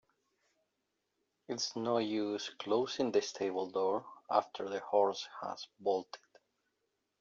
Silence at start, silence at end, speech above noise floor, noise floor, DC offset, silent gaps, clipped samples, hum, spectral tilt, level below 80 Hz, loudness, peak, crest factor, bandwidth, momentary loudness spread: 1.5 s; 1.05 s; 49 dB; -84 dBFS; under 0.1%; none; under 0.1%; none; -3 dB/octave; -84 dBFS; -36 LUFS; -14 dBFS; 22 dB; 7.6 kHz; 10 LU